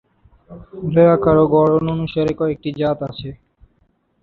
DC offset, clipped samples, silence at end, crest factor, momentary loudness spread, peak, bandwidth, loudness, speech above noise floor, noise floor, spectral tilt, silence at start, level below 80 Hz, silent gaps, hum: under 0.1%; under 0.1%; 0.85 s; 16 dB; 16 LU; -2 dBFS; 5.2 kHz; -16 LUFS; 45 dB; -62 dBFS; -9.5 dB/octave; 0.5 s; -44 dBFS; none; none